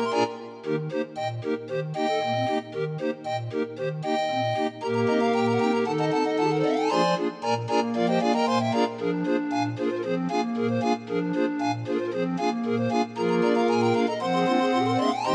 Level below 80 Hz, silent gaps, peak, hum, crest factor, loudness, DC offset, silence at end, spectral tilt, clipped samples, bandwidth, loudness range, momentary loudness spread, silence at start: -74 dBFS; none; -10 dBFS; none; 14 dB; -25 LUFS; under 0.1%; 0 s; -6 dB/octave; under 0.1%; 10 kHz; 4 LU; 7 LU; 0 s